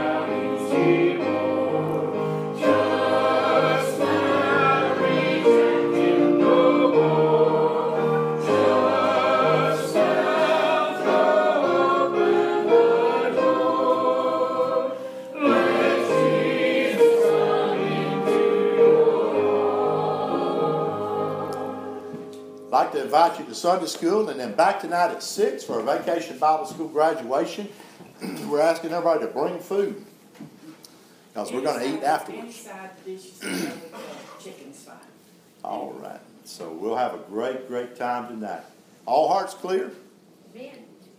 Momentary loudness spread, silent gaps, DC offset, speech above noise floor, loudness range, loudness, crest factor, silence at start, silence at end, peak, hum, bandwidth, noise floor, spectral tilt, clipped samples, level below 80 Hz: 17 LU; none; under 0.1%; 29 dB; 11 LU; -22 LUFS; 16 dB; 0 s; 0.35 s; -6 dBFS; none; 16 kHz; -53 dBFS; -5.5 dB/octave; under 0.1%; -76 dBFS